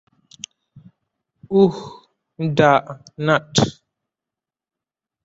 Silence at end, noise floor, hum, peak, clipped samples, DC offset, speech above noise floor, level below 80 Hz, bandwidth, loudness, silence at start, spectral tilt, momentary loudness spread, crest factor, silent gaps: 1.55 s; -89 dBFS; none; -2 dBFS; under 0.1%; under 0.1%; 71 dB; -56 dBFS; 8 kHz; -18 LUFS; 1.5 s; -5.5 dB/octave; 22 LU; 20 dB; none